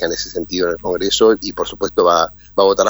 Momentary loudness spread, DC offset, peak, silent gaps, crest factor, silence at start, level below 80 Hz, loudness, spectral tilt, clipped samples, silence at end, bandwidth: 9 LU; under 0.1%; 0 dBFS; none; 16 dB; 0 s; -44 dBFS; -16 LUFS; -3 dB/octave; under 0.1%; 0 s; over 20 kHz